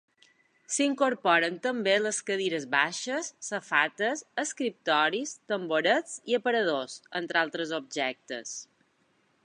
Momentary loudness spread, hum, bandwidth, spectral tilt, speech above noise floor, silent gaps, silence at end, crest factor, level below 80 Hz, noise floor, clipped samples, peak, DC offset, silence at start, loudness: 9 LU; none; 11.5 kHz; -2.5 dB/octave; 41 dB; none; 0.8 s; 22 dB; -86 dBFS; -70 dBFS; under 0.1%; -8 dBFS; under 0.1%; 0.7 s; -28 LUFS